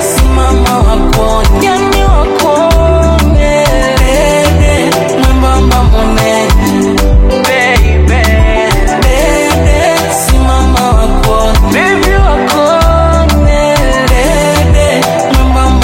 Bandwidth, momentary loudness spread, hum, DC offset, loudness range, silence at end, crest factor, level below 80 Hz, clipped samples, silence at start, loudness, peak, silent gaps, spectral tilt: 17 kHz; 2 LU; none; under 0.1%; 0 LU; 0 s; 6 dB; -10 dBFS; 0.4%; 0 s; -8 LUFS; 0 dBFS; none; -5 dB/octave